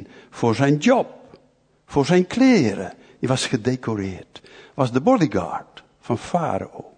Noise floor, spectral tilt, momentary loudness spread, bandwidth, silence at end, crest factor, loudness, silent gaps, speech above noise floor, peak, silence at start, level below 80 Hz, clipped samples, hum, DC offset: -59 dBFS; -6 dB/octave; 15 LU; 9.6 kHz; 0.1 s; 18 dB; -21 LUFS; none; 39 dB; -4 dBFS; 0 s; -56 dBFS; under 0.1%; none; under 0.1%